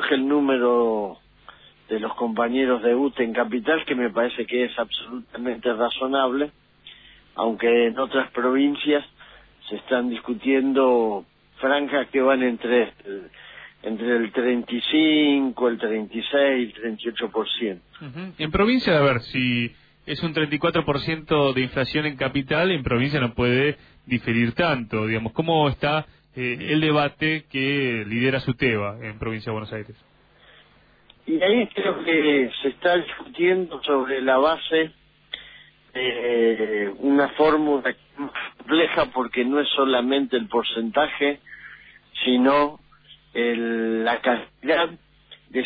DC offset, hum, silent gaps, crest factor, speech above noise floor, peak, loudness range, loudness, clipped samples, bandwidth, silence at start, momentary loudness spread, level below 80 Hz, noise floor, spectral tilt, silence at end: under 0.1%; none; none; 16 dB; 34 dB; -8 dBFS; 3 LU; -22 LUFS; under 0.1%; 5 kHz; 0 s; 12 LU; -52 dBFS; -56 dBFS; -8.5 dB/octave; 0 s